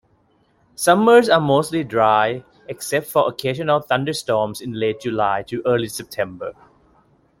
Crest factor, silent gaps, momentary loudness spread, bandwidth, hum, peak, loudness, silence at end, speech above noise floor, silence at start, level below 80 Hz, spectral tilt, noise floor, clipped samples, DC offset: 18 dB; none; 14 LU; 16.5 kHz; none; -2 dBFS; -19 LUFS; 0.9 s; 42 dB; 0.8 s; -58 dBFS; -5 dB/octave; -60 dBFS; under 0.1%; under 0.1%